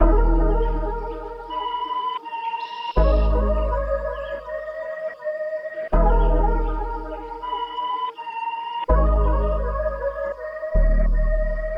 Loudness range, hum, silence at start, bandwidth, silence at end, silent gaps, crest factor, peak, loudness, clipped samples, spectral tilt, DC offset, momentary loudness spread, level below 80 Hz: 1 LU; none; 0 s; 5.4 kHz; 0 s; none; 16 dB; -4 dBFS; -24 LUFS; under 0.1%; -9 dB/octave; under 0.1%; 10 LU; -22 dBFS